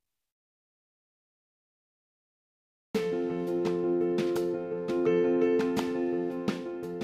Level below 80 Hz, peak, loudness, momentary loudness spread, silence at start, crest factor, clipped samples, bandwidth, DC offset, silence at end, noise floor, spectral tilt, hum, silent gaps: -68 dBFS; -14 dBFS; -29 LUFS; 8 LU; 2.95 s; 18 dB; under 0.1%; 14.5 kHz; under 0.1%; 0 s; under -90 dBFS; -7 dB/octave; none; none